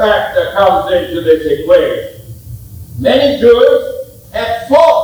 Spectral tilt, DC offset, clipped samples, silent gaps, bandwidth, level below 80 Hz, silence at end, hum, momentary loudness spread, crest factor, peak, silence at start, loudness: -5.5 dB/octave; under 0.1%; 0.4%; none; over 20 kHz; -38 dBFS; 0 s; none; 21 LU; 12 dB; 0 dBFS; 0 s; -11 LUFS